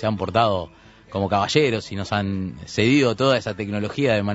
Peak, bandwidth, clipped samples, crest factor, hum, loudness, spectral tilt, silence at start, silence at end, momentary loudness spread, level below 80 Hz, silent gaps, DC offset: -4 dBFS; 8 kHz; under 0.1%; 18 dB; none; -22 LUFS; -5.5 dB/octave; 0 s; 0 s; 10 LU; -52 dBFS; none; under 0.1%